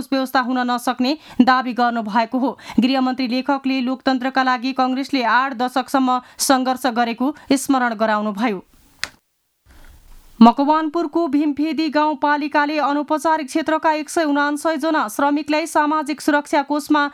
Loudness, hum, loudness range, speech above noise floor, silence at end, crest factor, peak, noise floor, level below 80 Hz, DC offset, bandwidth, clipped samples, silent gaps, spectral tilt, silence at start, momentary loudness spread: -19 LUFS; none; 2 LU; 48 dB; 0 s; 18 dB; 0 dBFS; -66 dBFS; -56 dBFS; under 0.1%; 15 kHz; under 0.1%; none; -4 dB/octave; 0 s; 4 LU